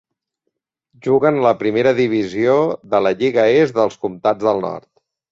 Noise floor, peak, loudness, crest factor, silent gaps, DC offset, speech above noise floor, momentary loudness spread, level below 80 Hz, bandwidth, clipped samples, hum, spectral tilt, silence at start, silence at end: -76 dBFS; -2 dBFS; -16 LUFS; 16 dB; none; under 0.1%; 60 dB; 7 LU; -58 dBFS; 7.6 kHz; under 0.1%; none; -7 dB/octave; 1.05 s; 0.5 s